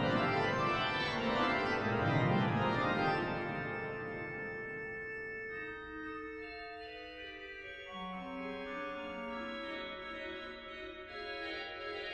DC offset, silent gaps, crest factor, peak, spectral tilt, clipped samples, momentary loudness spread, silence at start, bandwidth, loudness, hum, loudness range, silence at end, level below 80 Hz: under 0.1%; none; 18 dB; -18 dBFS; -6.5 dB/octave; under 0.1%; 14 LU; 0 s; 10 kHz; -37 LUFS; none; 11 LU; 0 s; -60 dBFS